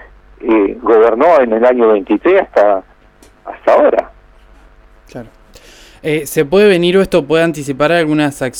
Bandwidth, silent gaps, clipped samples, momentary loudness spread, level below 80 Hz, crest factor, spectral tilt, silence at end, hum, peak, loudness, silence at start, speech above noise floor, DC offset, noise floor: 18 kHz; none; under 0.1%; 10 LU; -42 dBFS; 12 dB; -5.5 dB/octave; 0 s; none; 0 dBFS; -11 LUFS; 0.4 s; 34 dB; under 0.1%; -45 dBFS